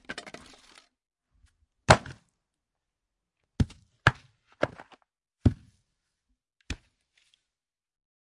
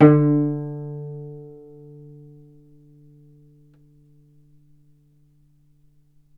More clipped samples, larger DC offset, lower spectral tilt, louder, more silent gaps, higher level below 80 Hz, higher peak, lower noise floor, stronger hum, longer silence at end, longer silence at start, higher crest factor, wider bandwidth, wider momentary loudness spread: neither; neither; second, -5 dB/octave vs -12 dB/octave; second, -28 LUFS vs -22 LUFS; neither; first, -46 dBFS vs -64 dBFS; second, -4 dBFS vs 0 dBFS; first, under -90 dBFS vs -58 dBFS; neither; second, 1.5 s vs 4.9 s; about the same, 0.1 s vs 0 s; first, 30 dB vs 24 dB; first, 11.5 kHz vs 3.3 kHz; second, 24 LU vs 28 LU